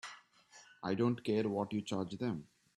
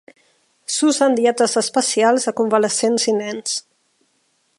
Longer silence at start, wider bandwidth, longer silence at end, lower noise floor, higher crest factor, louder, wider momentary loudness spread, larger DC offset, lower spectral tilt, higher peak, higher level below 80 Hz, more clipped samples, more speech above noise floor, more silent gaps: second, 0.05 s vs 0.7 s; about the same, 12 kHz vs 11.5 kHz; second, 0.35 s vs 1 s; about the same, -62 dBFS vs -65 dBFS; about the same, 18 dB vs 16 dB; second, -37 LUFS vs -18 LUFS; first, 11 LU vs 8 LU; neither; first, -6.5 dB/octave vs -2.5 dB/octave; second, -20 dBFS vs -2 dBFS; about the same, -74 dBFS vs -74 dBFS; neither; second, 27 dB vs 47 dB; neither